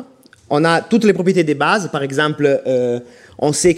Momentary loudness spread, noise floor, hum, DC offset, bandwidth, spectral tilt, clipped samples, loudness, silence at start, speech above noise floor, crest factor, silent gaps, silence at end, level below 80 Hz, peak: 7 LU; -42 dBFS; none; under 0.1%; 15.5 kHz; -5 dB/octave; under 0.1%; -16 LUFS; 0 s; 27 dB; 14 dB; none; 0 s; -52 dBFS; -2 dBFS